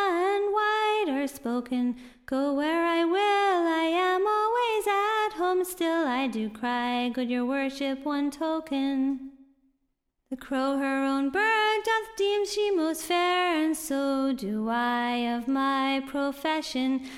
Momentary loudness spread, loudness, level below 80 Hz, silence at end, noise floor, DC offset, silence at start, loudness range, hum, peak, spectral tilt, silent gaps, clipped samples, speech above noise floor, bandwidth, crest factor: 6 LU; -27 LUFS; -64 dBFS; 0 s; -77 dBFS; under 0.1%; 0 s; 5 LU; none; -12 dBFS; -3.5 dB/octave; none; under 0.1%; 50 dB; 16.5 kHz; 14 dB